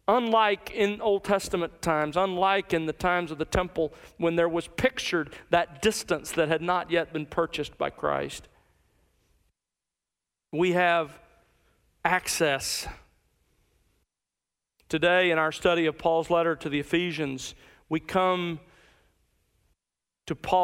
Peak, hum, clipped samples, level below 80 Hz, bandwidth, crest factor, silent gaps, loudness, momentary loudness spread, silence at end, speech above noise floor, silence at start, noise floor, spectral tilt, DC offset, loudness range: -8 dBFS; none; under 0.1%; -52 dBFS; 16 kHz; 20 dB; none; -27 LUFS; 10 LU; 0 s; 62 dB; 0.1 s; -89 dBFS; -4 dB/octave; under 0.1%; 5 LU